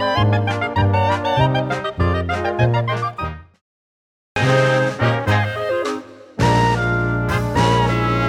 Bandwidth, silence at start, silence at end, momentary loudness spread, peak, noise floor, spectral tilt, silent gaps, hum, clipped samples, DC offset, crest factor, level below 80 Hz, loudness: 12.5 kHz; 0 s; 0 s; 9 LU; -4 dBFS; under -90 dBFS; -6.5 dB/octave; 3.61-4.36 s; none; under 0.1%; under 0.1%; 14 dB; -36 dBFS; -18 LUFS